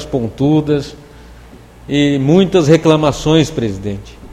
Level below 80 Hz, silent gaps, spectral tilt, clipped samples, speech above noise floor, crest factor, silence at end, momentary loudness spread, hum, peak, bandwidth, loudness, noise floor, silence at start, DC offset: -36 dBFS; none; -6.5 dB/octave; under 0.1%; 25 dB; 14 dB; 0 s; 13 LU; none; 0 dBFS; 13 kHz; -13 LUFS; -38 dBFS; 0 s; under 0.1%